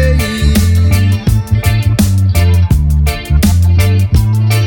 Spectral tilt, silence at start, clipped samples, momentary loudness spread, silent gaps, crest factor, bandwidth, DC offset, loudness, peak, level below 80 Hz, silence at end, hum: -6 dB/octave; 0 s; under 0.1%; 3 LU; none; 8 dB; 18.5 kHz; under 0.1%; -11 LUFS; 0 dBFS; -16 dBFS; 0 s; none